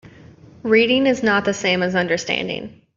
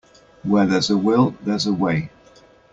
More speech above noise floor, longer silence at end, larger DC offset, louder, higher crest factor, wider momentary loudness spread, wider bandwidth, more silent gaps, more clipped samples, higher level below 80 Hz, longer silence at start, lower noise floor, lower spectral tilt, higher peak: second, 26 dB vs 32 dB; second, 0.25 s vs 0.65 s; neither; about the same, -18 LUFS vs -19 LUFS; about the same, 16 dB vs 16 dB; about the same, 11 LU vs 9 LU; about the same, 7.6 kHz vs 7.8 kHz; neither; neither; about the same, -56 dBFS vs -54 dBFS; second, 0.05 s vs 0.45 s; second, -44 dBFS vs -50 dBFS; second, -4.5 dB/octave vs -6 dB/octave; about the same, -4 dBFS vs -4 dBFS